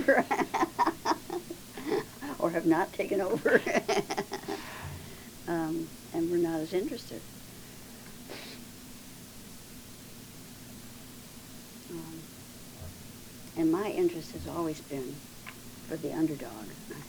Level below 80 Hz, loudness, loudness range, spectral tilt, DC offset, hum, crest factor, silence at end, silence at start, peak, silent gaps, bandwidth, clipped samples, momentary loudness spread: -58 dBFS; -32 LUFS; 16 LU; -5 dB/octave; under 0.1%; none; 26 dB; 0 s; 0 s; -8 dBFS; none; over 20 kHz; under 0.1%; 19 LU